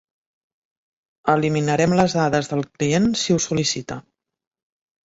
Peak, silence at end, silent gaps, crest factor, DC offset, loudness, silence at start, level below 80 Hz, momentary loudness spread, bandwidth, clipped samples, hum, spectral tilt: -2 dBFS; 1.05 s; none; 20 dB; under 0.1%; -20 LUFS; 1.25 s; -54 dBFS; 9 LU; 8 kHz; under 0.1%; none; -5 dB/octave